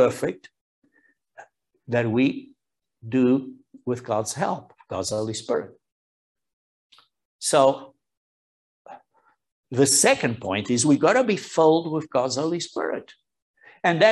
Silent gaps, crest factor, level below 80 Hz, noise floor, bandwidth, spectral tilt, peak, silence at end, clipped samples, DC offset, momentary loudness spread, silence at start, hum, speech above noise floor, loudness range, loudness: 0.61-0.82 s, 5.92-6.35 s, 6.53-6.90 s, 7.25-7.39 s, 8.17-8.85 s, 9.52-9.63 s, 13.42-13.54 s; 22 dB; -68 dBFS; -70 dBFS; 13 kHz; -4 dB/octave; -4 dBFS; 0 s; under 0.1%; under 0.1%; 14 LU; 0 s; none; 48 dB; 9 LU; -23 LUFS